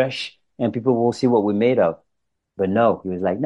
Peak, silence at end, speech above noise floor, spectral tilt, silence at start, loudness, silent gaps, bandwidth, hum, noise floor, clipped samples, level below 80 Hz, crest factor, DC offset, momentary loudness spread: -6 dBFS; 0 s; 57 dB; -7 dB/octave; 0 s; -20 LUFS; none; 11 kHz; none; -76 dBFS; under 0.1%; -62 dBFS; 16 dB; under 0.1%; 9 LU